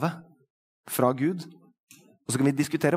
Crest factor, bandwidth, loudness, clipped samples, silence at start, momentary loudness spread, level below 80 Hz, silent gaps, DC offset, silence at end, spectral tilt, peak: 22 dB; 16 kHz; -27 LUFS; under 0.1%; 0 s; 19 LU; -72 dBFS; 0.50-0.84 s, 1.80-1.87 s; under 0.1%; 0 s; -5.5 dB/octave; -8 dBFS